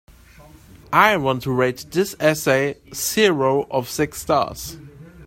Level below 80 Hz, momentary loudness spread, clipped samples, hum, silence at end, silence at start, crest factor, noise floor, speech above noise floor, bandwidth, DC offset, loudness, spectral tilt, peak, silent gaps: -50 dBFS; 9 LU; under 0.1%; none; 0 s; 0.4 s; 20 dB; -46 dBFS; 27 dB; 16.5 kHz; under 0.1%; -20 LUFS; -4 dB/octave; 0 dBFS; none